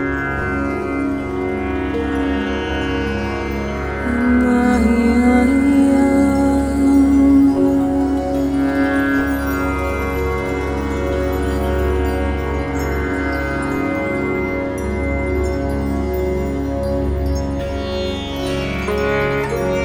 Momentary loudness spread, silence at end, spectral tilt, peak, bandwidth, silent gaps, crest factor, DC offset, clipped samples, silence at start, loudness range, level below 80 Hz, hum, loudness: 8 LU; 0 s; -7 dB/octave; -2 dBFS; 16 kHz; none; 14 dB; under 0.1%; under 0.1%; 0 s; 7 LU; -26 dBFS; none; -18 LUFS